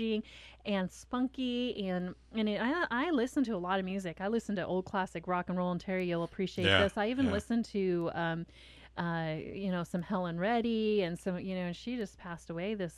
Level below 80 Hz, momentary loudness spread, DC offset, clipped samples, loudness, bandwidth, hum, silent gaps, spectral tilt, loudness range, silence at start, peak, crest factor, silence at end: -56 dBFS; 8 LU; under 0.1%; under 0.1%; -34 LUFS; 13 kHz; none; none; -6 dB/octave; 3 LU; 0 s; -10 dBFS; 24 dB; 0 s